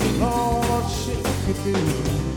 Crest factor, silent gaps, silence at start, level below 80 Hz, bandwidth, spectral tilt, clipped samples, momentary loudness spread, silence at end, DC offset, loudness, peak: 16 dB; none; 0 s; -32 dBFS; 19 kHz; -5.5 dB/octave; under 0.1%; 4 LU; 0 s; under 0.1%; -23 LUFS; -6 dBFS